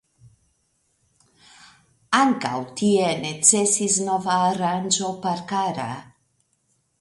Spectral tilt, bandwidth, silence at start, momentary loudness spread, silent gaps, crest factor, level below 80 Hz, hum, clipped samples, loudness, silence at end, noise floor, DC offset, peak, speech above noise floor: -3 dB/octave; 11.5 kHz; 2.1 s; 11 LU; none; 24 dB; -66 dBFS; none; under 0.1%; -21 LUFS; 0.95 s; -69 dBFS; under 0.1%; -2 dBFS; 47 dB